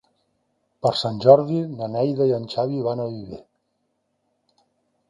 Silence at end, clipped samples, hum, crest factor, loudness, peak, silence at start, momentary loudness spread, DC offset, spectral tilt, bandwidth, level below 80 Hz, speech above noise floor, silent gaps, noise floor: 1.7 s; under 0.1%; none; 22 dB; -21 LUFS; 0 dBFS; 0.85 s; 16 LU; under 0.1%; -7.5 dB/octave; 10.5 kHz; -62 dBFS; 52 dB; none; -73 dBFS